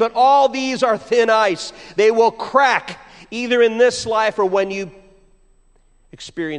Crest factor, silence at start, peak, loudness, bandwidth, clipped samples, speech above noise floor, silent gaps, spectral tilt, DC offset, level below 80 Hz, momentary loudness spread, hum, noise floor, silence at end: 16 dB; 0 s; -2 dBFS; -17 LUFS; 10.5 kHz; under 0.1%; 37 dB; none; -3.5 dB/octave; under 0.1%; -54 dBFS; 17 LU; none; -54 dBFS; 0 s